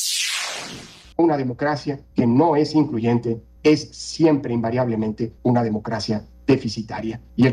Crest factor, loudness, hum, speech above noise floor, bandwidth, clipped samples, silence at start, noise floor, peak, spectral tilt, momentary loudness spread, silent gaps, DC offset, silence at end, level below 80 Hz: 16 dB; -21 LUFS; none; 19 dB; 16 kHz; under 0.1%; 0 s; -39 dBFS; -4 dBFS; -5.5 dB/octave; 11 LU; none; under 0.1%; 0 s; -52 dBFS